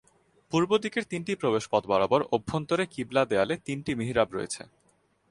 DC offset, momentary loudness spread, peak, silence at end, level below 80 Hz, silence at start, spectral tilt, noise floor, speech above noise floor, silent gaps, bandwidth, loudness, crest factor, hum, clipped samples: under 0.1%; 7 LU; -8 dBFS; 0.65 s; -58 dBFS; 0.5 s; -5 dB/octave; -68 dBFS; 40 dB; none; 11.5 kHz; -28 LUFS; 20 dB; none; under 0.1%